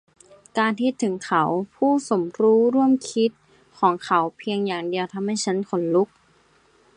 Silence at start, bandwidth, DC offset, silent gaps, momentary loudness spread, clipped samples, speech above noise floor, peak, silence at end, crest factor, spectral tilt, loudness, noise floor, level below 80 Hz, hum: 0.55 s; 10.5 kHz; under 0.1%; none; 8 LU; under 0.1%; 38 dB; -6 dBFS; 0.9 s; 18 dB; -5 dB/octave; -22 LUFS; -59 dBFS; -70 dBFS; none